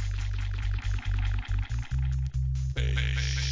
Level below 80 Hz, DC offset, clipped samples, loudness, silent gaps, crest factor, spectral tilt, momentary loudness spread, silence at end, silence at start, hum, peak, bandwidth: -30 dBFS; 0.2%; under 0.1%; -31 LUFS; none; 14 dB; -4.5 dB/octave; 4 LU; 0 s; 0 s; none; -14 dBFS; 7.6 kHz